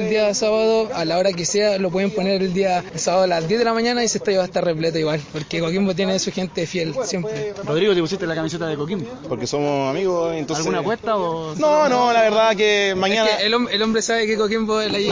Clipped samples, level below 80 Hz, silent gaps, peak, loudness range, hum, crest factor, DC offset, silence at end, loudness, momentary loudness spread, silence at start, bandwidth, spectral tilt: under 0.1%; -54 dBFS; none; -6 dBFS; 5 LU; none; 14 dB; under 0.1%; 0 s; -20 LUFS; 8 LU; 0 s; 7.6 kHz; -4 dB/octave